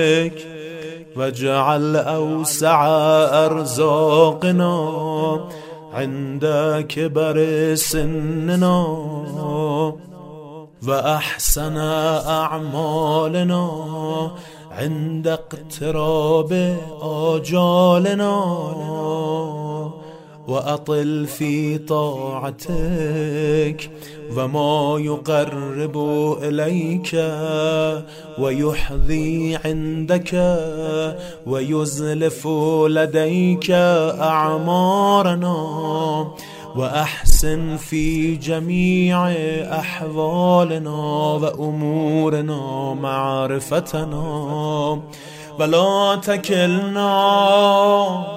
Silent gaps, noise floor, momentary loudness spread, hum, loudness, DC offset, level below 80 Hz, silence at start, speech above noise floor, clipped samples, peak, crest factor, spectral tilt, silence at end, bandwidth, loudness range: none; -39 dBFS; 12 LU; none; -19 LUFS; under 0.1%; -32 dBFS; 0 s; 20 dB; under 0.1%; 0 dBFS; 18 dB; -5.5 dB/octave; 0 s; 16 kHz; 5 LU